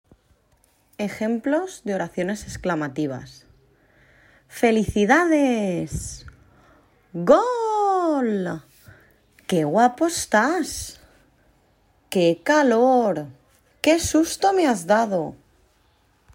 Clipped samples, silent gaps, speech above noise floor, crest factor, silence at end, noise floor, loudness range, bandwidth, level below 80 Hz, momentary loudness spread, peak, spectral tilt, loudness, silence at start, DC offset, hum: under 0.1%; none; 41 dB; 18 dB; 1 s; -62 dBFS; 7 LU; 16 kHz; -50 dBFS; 14 LU; -4 dBFS; -4.5 dB/octave; -21 LUFS; 1 s; under 0.1%; none